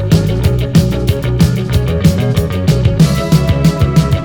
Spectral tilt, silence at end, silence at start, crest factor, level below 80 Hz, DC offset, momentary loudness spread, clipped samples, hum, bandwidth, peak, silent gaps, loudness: -7 dB/octave; 0 s; 0 s; 10 dB; -22 dBFS; under 0.1%; 4 LU; 0.2%; none; 18.5 kHz; 0 dBFS; none; -12 LUFS